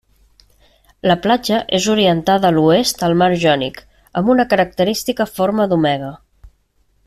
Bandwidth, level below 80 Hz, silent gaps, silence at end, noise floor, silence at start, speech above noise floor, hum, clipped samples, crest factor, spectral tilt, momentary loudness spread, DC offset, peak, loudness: 15 kHz; -48 dBFS; none; 0.6 s; -60 dBFS; 1.05 s; 45 dB; none; under 0.1%; 14 dB; -5 dB/octave; 7 LU; under 0.1%; -2 dBFS; -16 LUFS